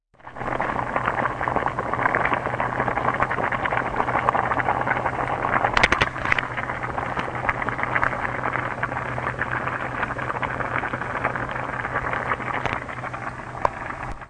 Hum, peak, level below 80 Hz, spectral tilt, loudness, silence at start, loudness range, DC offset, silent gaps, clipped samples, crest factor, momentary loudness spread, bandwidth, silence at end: none; 0 dBFS; -44 dBFS; -5.5 dB/octave; -24 LUFS; 0.25 s; 4 LU; under 0.1%; none; under 0.1%; 24 dB; 6 LU; 10.5 kHz; 0 s